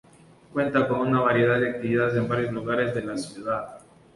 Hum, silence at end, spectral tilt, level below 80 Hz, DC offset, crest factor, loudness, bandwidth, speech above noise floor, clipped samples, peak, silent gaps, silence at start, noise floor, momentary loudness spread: none; 0.35 s; -7 dB/octave; -58 dBFS; under 0.1%; 16 dB; -25 LUFS; 11.5 kHz; 29 dB; under 0.1%; -8 dBFS; none; 0.55 s; -53 dBFS; 11 LU